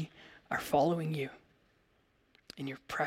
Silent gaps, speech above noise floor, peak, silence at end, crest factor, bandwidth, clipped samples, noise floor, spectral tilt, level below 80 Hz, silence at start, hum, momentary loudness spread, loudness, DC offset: none; 38 dB; -16 dBFS; 0 s; 20 dB; 16.5 kHz; under 0.1%; -72 dBFS; -6 dB/octave; -68 dBFS; 0 s; none; 18 LU; -35 LUFS; under 0.1%